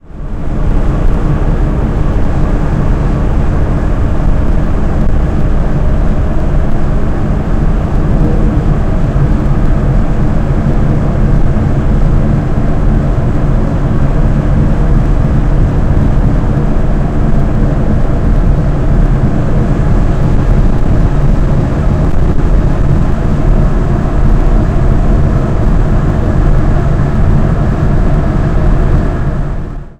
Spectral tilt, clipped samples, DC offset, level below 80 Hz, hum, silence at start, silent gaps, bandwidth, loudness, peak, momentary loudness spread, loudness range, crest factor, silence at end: -9 dB/octave; 0.2%; 0.7%; -10 dBFS; none; 0.1 s; none; 7.6 kHz; -13 LUFS; 0 dBFS; 3 LU; 2 LU; 8 dB; 0.05 s